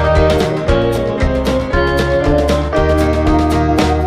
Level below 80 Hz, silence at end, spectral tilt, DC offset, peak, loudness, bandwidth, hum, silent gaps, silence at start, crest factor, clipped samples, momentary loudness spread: -20 dBFS; 0 s; -6.5 dB/octave; under 0.1%; 0 dBFS; -14 LUFS; 15 kHz; none; none; 0 s; 12 dB; under 0.1%; 3 LU